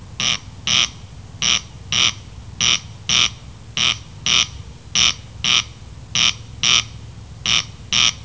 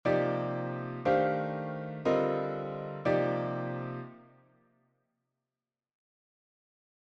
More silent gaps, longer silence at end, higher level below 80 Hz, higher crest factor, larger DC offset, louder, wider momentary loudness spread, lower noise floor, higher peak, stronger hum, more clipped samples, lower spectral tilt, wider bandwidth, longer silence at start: neither; second, 0 s vs 2.8 s; first, -42 dBFS vs -68 dBFS; about the same, 18 dB vs 18 dB; first, 0.4% vs under 0.1%; first, -17 LUFS vs -32 LUFS; about the same, 11 LU vs 10 LU; second, -37 dBFS vs under -90 dBFS; first, -2 dBFS vs -14 dBFS; neither; neither; second, 0 dB/octave vs -8.5 dB/octave; about the same, 8 kHz vs 7.4 kHz; about the same, 0 s vs 0.05 s